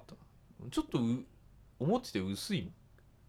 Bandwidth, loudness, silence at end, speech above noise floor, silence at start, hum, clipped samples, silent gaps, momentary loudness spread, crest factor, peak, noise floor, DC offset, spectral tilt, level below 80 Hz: 16 kHz; -36 LUFS; 0.55 s; 23 dB; 0 s; none; under 0.1%; none; 17 LU; 20 dB; -18 dBFS; -57 dBFS; under 0.1%; -6 dB/octave; -60 dBFS